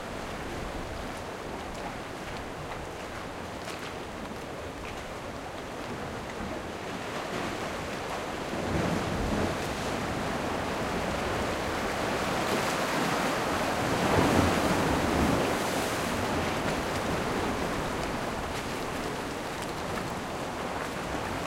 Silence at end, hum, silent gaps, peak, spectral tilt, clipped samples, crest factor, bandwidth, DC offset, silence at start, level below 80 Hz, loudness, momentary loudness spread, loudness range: 0 s; none; none; -12 dBFS; -4.5 dB/octave; under 0.1%; 20 dB; 16 kHz; under 0.1%; 0 s; -46 dBFS; -31 LUFS; 11 LU; 11 LU